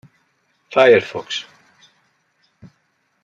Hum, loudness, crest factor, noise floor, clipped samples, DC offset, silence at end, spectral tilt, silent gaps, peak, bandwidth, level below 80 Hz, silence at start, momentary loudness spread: none; -16 LUFS; 20 dB; -66 dBFS; under 0.1%; under 0.1%; 1.8 s; -4 dB/octave; none; -2 dBFS; 7.6 kHz; -68 dBFS; 0.7 s; 15 LU